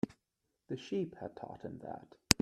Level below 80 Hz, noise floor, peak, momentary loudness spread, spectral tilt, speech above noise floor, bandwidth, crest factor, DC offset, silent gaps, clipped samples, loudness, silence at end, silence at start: -58 dBFS; -85 dBFS; 0 dBFS; 10 LU; -3 dB/octave; 43 dB; 13 kHz; 38 dB; under 0.1%; none; under 0.1%; -40 LUFS; 0.1 s; 0.05 s